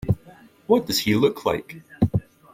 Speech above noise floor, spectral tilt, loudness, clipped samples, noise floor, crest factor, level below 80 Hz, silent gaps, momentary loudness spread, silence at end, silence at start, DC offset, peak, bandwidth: 28 dB; -5.5 dB/octave; -23 LUFS; under 0.1%; -50 dBFS; 20 dB; -46 dBFS; none; 10 LU; 0.35 s; 0 s; under 0.1%; -4 dBFS; 16 kHz